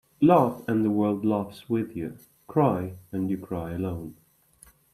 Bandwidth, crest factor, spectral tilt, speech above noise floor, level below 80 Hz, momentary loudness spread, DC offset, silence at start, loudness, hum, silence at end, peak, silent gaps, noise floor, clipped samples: 13.5 kHz; 20 dB; -9 dB/octave; 32 dB; -60 dBFS; 14 LU; under 0.1%; 0.2 s; -26 LUFS; none; 0.8 s; -6 dBFS; none; -57 dBFS; under 0.1%